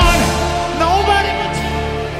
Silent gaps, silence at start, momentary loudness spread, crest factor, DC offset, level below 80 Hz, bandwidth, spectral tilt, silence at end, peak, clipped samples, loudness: none; 0 s; 7 LU; 14 dB; under 0.1%; -22 dBFS; 16 kHz; -4.5 dB/octave; 0 s; 0 dBFS; under 0.1%; -16 LUFS